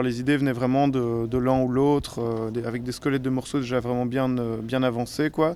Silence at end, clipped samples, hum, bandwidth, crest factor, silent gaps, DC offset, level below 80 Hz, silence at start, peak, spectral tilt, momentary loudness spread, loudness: 0 s; under 0.1%; none; 13.5 kHz; 14 dB; none; under 0.1%; -48 dBFS; 0 s; -10 dBFS; -7 dB/octave; 6 LU; -25 LUFS